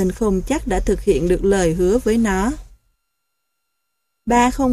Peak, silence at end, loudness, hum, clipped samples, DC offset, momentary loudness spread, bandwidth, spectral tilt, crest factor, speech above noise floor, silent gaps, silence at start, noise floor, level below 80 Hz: -4 dBFS; 0 s; -18 LUFS; none; under 0.1%; under 0.1%; 5 LU; 15 kHz; -6 dB/octave; 16 dB; 59 dB; none; 0 s; -76 dBFS; -30 dBFS